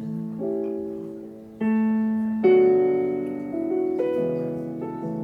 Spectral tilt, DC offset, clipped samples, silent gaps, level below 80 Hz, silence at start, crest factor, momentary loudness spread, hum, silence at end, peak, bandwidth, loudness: -9.5 dB/octave; under 0.1%; under 0.1%; none; -64 dBFS; 0 s; 16 dB; 14 LU; none; 0 s; -8 dBFS; 4.9 kHz; -24 LUFS